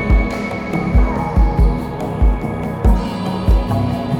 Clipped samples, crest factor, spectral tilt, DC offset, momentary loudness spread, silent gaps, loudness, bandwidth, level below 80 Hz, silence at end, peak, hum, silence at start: under 0.1%; 14 dB; -8 dB/octave; under 0.1%; 6 LU; none; -18 LUFS; 7.4 kHz; -18 dBFS; 0 s; -2 dBFS; none; 0 s